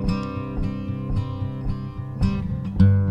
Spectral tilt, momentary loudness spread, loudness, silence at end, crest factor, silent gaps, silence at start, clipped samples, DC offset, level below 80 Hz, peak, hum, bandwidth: -9.5 dB/octave; 11 LU; -25 LUFS; 0 s; 18 dB; none; 0 s; under 0.1%; under 0.1%; -32 dBFS; -4 dBFS; none; 7.8 kHz